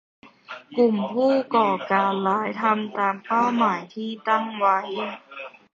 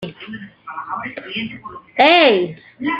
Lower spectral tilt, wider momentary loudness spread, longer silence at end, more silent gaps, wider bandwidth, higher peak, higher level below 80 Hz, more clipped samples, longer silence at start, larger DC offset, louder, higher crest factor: about the same, -6.5 dB/octave vs -6 dB/octave; second, 12 LU vs 22 LU; first, 0.25 s vs 0 s; neither; about the same, 7.4 kHz vs 8 kHz; second, -6 dBFS vs -2 dBFS; second, -74 dBFS vs -60 dBFS; neither; first, 0.25 s vs 0 s; neither; second, -23 LUFS vs -16 LUFS; about the same, 18 dB vs 18 dB